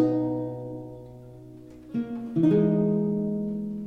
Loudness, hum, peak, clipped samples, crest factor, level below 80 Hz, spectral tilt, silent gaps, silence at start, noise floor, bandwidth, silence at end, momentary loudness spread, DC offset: -26 LUFS; none; -12 dBFS; under 0.1%; 16 dB; -58 dBFS; -11 dB/octave; none; 0 s; -45 dBFS; 4.9 kHz; 0 s; 24 LU; under 0.1%